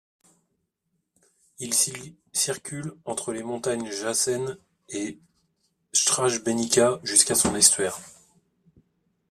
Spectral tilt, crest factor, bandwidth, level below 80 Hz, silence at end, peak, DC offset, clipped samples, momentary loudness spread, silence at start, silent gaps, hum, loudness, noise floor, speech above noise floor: -2 dB/octave; 26 dB; 15.5 kHz; -62 dBFS; 1.2 s; -2 dBFS; under 0.1%; under 0.1%; 17 LU; 1.6 s; none; none; -23 LUFS; -77 dBFS; 52 dB